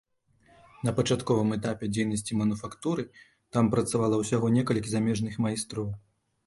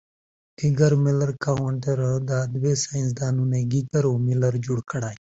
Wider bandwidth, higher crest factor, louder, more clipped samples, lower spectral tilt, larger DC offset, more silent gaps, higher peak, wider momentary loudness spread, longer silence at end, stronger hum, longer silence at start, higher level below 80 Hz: first, 11.5 kHz vs 8 kHz; about the same, 18 dB vs 16 dB; second, -28 LUFS vs -23 LUFS; neither; about the same, -6 dB/octave vs -6.5 dB/octave; neither; neither; second, -10 dBFS vs -6 dBFS; about the same, 8 LU vs 7 LU; first, 0.5 s vs 0.2 s; neither; first, 0.8 s vs 0.6 s; about the same, -56 dBFS vs -54 dBFS